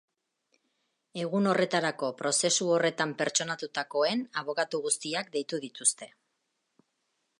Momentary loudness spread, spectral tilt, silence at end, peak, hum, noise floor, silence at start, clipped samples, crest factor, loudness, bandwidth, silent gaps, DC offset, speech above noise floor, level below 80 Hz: 9 LU; -2.5 dB/octave; 1.3 s; -10 dBFS; none; -80 dBFS; 1.15 s; under 0.1%; 22 dB; -29 LUFS; 11.5 kHz; none; under 0.1%; 50 dB; -82 dBFS